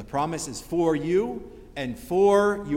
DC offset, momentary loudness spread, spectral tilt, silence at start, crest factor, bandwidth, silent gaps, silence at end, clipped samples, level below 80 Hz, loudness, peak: under 0.1%; 14 LU; -5.5 dB/octave; 0 s; 16 dB; 16.5 kHz; none; 0 s; under 0.1%; -50 dBFS; -24 LUFS; -10 dBFS